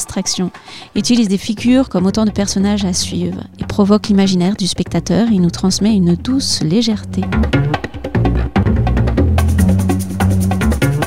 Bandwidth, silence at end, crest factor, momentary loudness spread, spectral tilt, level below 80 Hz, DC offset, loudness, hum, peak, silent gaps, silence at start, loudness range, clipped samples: 16 kHz; 0 s; 14 dB; 6 LU; -5.5 dB/octave; -24 dBFS; under 0.1%; -15 LUFS; none; 0 dBFS; none; 0 s; 1 LU; under 0.1%